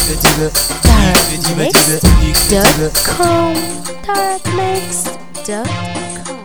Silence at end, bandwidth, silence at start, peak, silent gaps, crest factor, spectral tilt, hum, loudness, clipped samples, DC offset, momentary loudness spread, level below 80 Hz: 0 s; over 20 kHz; 0 s; 0 dBFS; none; 12 dB; -3.5 dB/octave; none; -12 LUFS; 0.2%; 4%; 13 LU; -20 dBFS